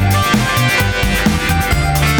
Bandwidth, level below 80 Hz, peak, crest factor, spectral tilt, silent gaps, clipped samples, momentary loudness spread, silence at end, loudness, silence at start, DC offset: 19 kHz; -22 dBFS; -2 dBFS; 12 dB; -4.5 dB/octave; none; under 0.1%; 2 LU; 0 s; -14 LUFS; 0 s; under 0.1%